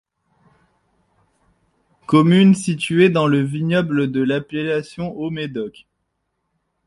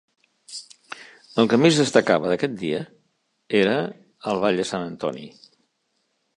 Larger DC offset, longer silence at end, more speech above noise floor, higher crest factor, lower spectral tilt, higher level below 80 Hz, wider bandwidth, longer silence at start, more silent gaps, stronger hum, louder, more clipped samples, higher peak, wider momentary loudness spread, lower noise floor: neither; about the same, 1.15 s vs 1.1 s; first, 56 dB vs 51 dB; about the same, 18 dB vs 22 dB; first, -6.5 dB/octave vs -5 dB/octave; first, -58 dBFS vs -66 dBFS; about the same, 11.5 kHz vs 11.5 kHz; first, 2.1 s vs 0.5 s; neither; neither; first, -18 LUFS vs -22 LUFS; neither; about the same, 0 dBFS vs -2 dBFS; second, 14 LU vs 23 LU; about the same, -73 dBFS vs -72 dBFS